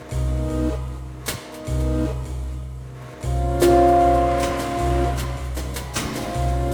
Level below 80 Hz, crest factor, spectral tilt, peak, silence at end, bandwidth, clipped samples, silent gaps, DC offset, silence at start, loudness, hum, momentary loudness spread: -28 dBFS; 18 dB; -6 dB/octave; -4 dBFS; 0 s; over 20 kHz; under 0.1%; none; under 0.1%; 0 s; -22 LUFS; none; 16 LU